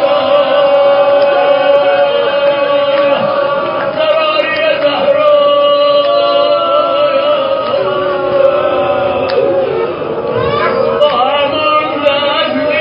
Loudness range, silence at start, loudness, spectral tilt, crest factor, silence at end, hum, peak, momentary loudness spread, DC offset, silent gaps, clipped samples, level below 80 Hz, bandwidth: 3 LU; 0 s; -11 LUFS; -7 dB/octave; 10 dB; 0 s; none; 0 dBFS; 5 LU; under 0.1%; none; under 0.1%; -46 dBFS; 5.4 kHz